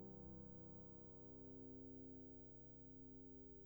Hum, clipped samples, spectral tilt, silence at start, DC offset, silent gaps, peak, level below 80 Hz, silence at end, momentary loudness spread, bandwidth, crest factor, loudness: none; under 0.1%; -10 dB/octave; 0 s; under 0.1%; none; -46 dBFS; -70 dBFS; 0 s; 2 LU; over 20 kHz; 12 dB; -57 LUFS